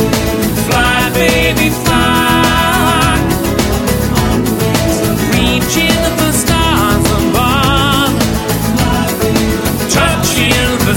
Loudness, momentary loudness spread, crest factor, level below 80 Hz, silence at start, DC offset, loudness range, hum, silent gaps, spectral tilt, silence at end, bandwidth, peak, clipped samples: -11 LUFS; 3 LU; 12 dB; -22 dBFS; 0 s; under 0.1%; 1 LU; none; none; -4 dB/octave; 0 s; over 20 kHz; 0 dBFS; under 0.1%